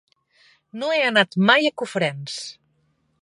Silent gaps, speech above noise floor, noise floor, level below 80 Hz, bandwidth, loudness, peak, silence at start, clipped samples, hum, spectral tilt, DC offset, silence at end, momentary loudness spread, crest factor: none; 46 dB; -67 dBFS; -74 dBFS; 11.5 kHz; -20 LUFS; 0 dBFS; 0.75 s; under 0.1%; none; -4.5 dB/octave; under 0.1%; 0.7 s; 16 LU; 22 dB